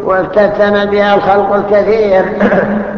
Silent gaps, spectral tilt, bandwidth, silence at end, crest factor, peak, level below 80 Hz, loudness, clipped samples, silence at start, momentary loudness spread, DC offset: none; -7.5 dB/octave; 6.6 kHz; 0 s; 10 dB; 0 dBFS; -40 dBFS; -10 LUFS; under 0.1%; 0 s; 2 LU; under 0.1%